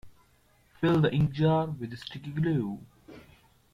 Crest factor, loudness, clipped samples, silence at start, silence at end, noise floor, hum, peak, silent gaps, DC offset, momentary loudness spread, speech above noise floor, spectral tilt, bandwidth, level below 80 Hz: 18 dB; -28 LUFS; under 0.1%; 0.05 s; 0.55 s; -64 dBFS; none; -12 dBFS; none; under 0.1%; 14 LU; 37 dB; -8.5 dB/octave; 6.6 kHz; -56 dBFS